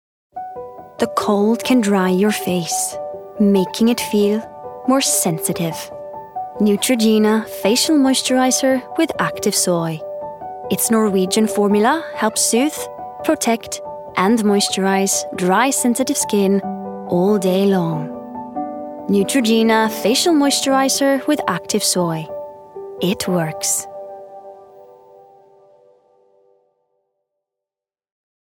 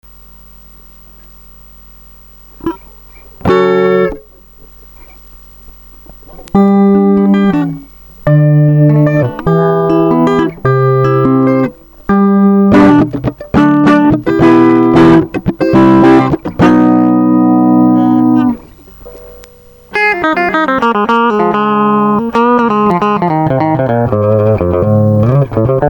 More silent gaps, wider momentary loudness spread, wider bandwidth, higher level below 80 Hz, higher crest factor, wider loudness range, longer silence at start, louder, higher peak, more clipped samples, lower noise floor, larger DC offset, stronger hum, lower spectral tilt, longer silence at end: neither; first, 15 LU vs 8 LU; about the same, 18 kHz vs 17.5 kHz; second, -60 dBFS vs -36 dBFS; first, 18 dB vs 10 dB; second, 4 LU vs 8 LU; second, 0.35 s vs 2.65 s; second, -17 LUFS vs -9 LUFS; about the same, -2 dBFS vs 0 dBFS; neither; first, -89 dBFS vs -38 dBFS; neither; neither; second, -4 dB/octave vs -9 dB/octave; first, 3.75 s vs 0 s